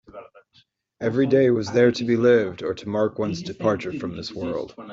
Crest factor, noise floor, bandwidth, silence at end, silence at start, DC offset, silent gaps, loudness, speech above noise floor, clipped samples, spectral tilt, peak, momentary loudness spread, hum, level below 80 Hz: 18 dB; -61 dBFS; 7.6 kHz; 0 s; 0.15 s; under 0.1%; none; -22 LUFS; 39 dB; under 0.1%; -6.5 dB/octave; -4 dBFS; 12 LU; none; -60 dBFS